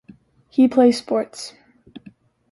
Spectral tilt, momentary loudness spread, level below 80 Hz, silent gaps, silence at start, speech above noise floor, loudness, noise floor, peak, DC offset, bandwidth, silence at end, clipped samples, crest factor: -5 dB/octave; 20 LU; -64 dBFS; none; 0.6 s; 32 dB; -18 LUFS; -50 dBFS; -4 dBFS; under 0.1%; 11.5 kHz; 1 s; under 0.1%; 18 dB